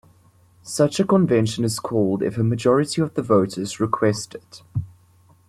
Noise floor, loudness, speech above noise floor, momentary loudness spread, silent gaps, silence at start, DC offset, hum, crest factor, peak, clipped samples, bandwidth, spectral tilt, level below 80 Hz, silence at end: -55 dBFS; -21 LUFS; 34 dB; 13 LU; none; 0.65 s; under 0.1%; none; 18 dB; -4 dBFS; under 0.1%; 14 kHz; -6 dB/octave; -56 dBFS; 0.6 s